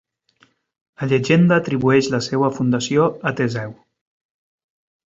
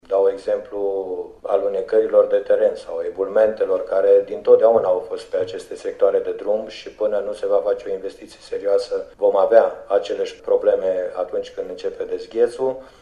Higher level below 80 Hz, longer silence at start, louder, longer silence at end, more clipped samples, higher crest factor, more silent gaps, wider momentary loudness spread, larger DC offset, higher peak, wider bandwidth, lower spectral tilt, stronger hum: about the same, -58 dBFS vs -56 dBFS; first, 1 s vs 0.1 s; about the same, -18 LUFS vs -20 LUFS; first, 1.3 s vs 0.15 s; neither; about the same, 18 dB vs 20 dB; neither; second, 9 LU vs 12 LU; neither; about the same, -2 dBFS vs 0 dBFS; second, 7.8 kHz vs 10 kHz; about the same, -6 dB/octave vs -5 dB/octave; neither